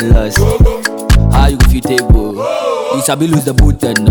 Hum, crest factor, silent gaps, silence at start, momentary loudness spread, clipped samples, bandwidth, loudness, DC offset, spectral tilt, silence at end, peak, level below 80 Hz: none; 10 dB; none; 0 s; 5 LU; under 0.1%; 19.5 kHz; -12 LUFS; under 0.1%; -5.5 dB/octave; 0 s; 0 dBFS; -12 dBFS